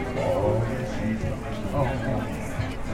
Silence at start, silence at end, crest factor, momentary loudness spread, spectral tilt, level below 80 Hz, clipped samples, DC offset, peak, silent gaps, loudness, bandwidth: 0 s; 0 s; 14 dB; 7 LU; -7 dB/octave; -38 dBFS; under 0.1%; under 0.1%; -12 dBFS; none; -27 LUFS; 16 kHz